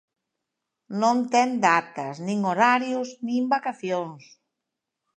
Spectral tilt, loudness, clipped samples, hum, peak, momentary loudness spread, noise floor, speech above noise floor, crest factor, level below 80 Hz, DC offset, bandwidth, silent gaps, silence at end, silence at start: -5 dB/octave; -24 LUFS; under 0.1%; none; -4 dBFS; 11 LU; -84 dBFS; 60 dB; 20 dB; -80 dBFS; under 0.1%; 9 kHz; none; 1 s; 0.9 s